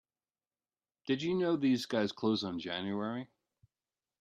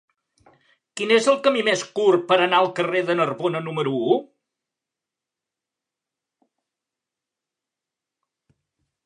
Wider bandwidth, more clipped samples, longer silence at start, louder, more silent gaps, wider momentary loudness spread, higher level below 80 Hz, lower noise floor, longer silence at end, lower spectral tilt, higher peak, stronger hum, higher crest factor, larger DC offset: first, 13.5 kHz vs 11 kHz; neither; about the same, 1.05 s vs 0.95 s; second, -34 LUFS vs -20 LUFS; neither; first, 11 LU vs 8 LU; about the same, -78 dBFS vs -78 dBFS; about the same, under -90 dBFS vs -87 dBFS; second, 0.95 s vs 4.8 s; first, -6 dB/octave vs -4.5 dB/octave; second, -18 dBFS vs -4 dBFS; neither; about the same, 18 dB vs 22 dB; neither